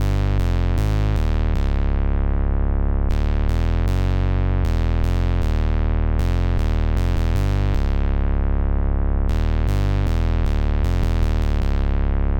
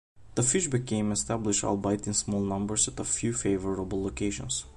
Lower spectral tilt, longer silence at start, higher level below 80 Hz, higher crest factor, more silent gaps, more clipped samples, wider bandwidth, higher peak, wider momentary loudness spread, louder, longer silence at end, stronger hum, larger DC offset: first, -8 dB/octave vs -4 dB/octave; second, 0 s vs 0.15 s; first, -20 dBFS vs -48 dBFS; second, 10 dB vs 18 dB; neither; neither; second, 8 kHz vs 11.5 kHz; first, -8 dBFS vs -12 dBFS; second, 1 LU vs 6 LU; first, -22 LUFS vs -28 LUFS; about the same, 0 s vs 0.05 s; neither; neither